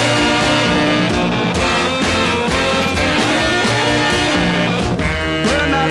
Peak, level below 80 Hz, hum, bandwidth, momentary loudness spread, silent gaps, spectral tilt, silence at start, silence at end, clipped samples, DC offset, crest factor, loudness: -2 dBFS; -32 dBFS; none; 12 kHz; 3 LU; none; -4 dB/octave; 0 s; 0 s; under 0.1%; under 0.1%; 12 dB; -15 LUFS